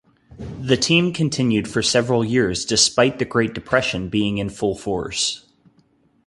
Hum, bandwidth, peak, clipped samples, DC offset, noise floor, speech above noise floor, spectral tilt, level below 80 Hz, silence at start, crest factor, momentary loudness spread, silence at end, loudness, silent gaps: none; 11.5 kHz; -2 dBFS; under 0.1%; under 0.1%; -59 dBFS; 40 dB; -4 dB/octave; -46 dBFS; 0.3 s; 18 dB; 8 LU; 0.9 s; -19 LUFS; none